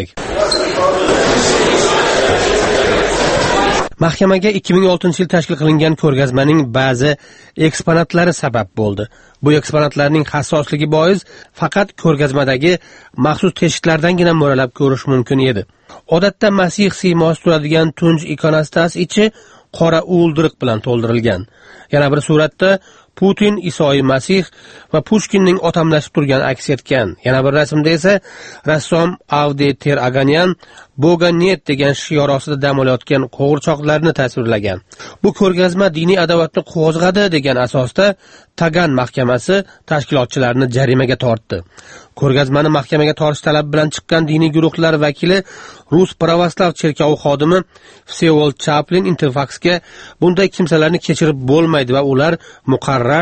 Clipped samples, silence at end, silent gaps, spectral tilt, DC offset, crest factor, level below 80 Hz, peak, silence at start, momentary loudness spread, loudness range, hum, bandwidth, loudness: under 0.1%; 0 s; none; -5.5 dB/octave; under 0.1%; 14 dB; -40 dBFS; 0 dBFS; 0 s; 5 LU; 2 LU; none; 8.8 kHz; -14 LUFS